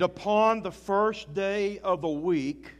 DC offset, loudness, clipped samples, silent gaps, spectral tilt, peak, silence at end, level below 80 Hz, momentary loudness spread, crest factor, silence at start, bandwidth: under 0.1%; -27 LUFS; under 0.1%; none; -6 dB/octave; -10 dBFS; 0.05 s; -58 dBFS; 6 LU; 16 dB; 0 s; 12 kHz